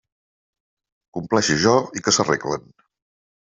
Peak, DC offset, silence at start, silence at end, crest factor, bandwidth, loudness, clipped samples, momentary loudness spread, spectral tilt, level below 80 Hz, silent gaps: -2 dBFS; under 0.1%; 1.15 s; 0.85 s; 20 dB; 8.2 kHz; -20 LUFS; under 0.1%; 14 LU; -3.5 dB/octave; -58 dBFS; none